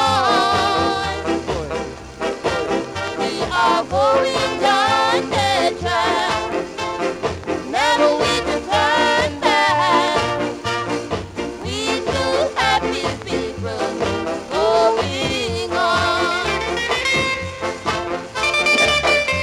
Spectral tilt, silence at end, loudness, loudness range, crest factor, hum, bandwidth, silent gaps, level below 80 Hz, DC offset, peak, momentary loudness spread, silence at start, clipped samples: -3.5 dB/octave; 0 s; -18 LUFS; 4 LU; 14 dB; none; 16 kHz; none; -42 dBFS; under 0.1%; -4 dBFS; 9 LU; 0 s; under 0.1%